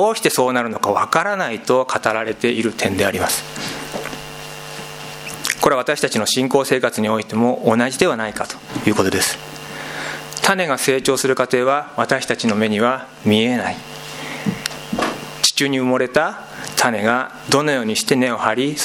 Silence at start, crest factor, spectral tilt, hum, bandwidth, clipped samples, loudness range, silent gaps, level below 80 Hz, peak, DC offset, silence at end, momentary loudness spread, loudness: 0 s; 18 dB; -3.5 dB/octave; none; 17.5 kHz; under 0.1%; 4 LU; none; -54 dBFS; 0 dBFS; under 0.1%; 0 s; 12 LU; -18 LUFS